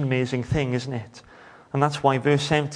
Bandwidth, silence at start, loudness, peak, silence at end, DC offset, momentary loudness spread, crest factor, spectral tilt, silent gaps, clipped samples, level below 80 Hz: 10.5 kHz; 0 s; -24 LUFS; -4 dBFS; 0 s; under 0.1%; 12 LU; 20 dB; -6 dB/octave; none; under 0.1%; -48 dBFS